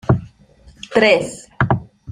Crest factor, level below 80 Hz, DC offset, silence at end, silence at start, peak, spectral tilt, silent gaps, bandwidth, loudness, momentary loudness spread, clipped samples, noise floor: 18 dB; -40 dBFS; under 0.1%; 0 s; 0.1 s; 0 dBFS; -6 dB/octave; none; 11 kHz; -17 LUFS; 13 LU; under 0.1%; -48 dBFS